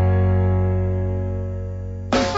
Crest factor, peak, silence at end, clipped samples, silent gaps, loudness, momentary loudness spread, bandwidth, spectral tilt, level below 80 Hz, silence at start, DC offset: 12 dB; -6 dBFS; 0 s; under 0.1%; none; -22 LUFS; 11 LU; 7.8 kHz; -7 dB/octave; -34 dBFS; 0 s; under 0.1%